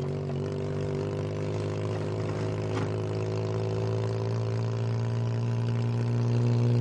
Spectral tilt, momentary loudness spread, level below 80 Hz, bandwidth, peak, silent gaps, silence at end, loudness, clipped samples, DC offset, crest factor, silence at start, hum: -8 dB/octave; 5 LU; -56 dBFS; 8.6 kHz; -14 dBFS; none; 0 s; -30 LUFS; under 0.1%; under 0.1%; 14 dB; 0 s; none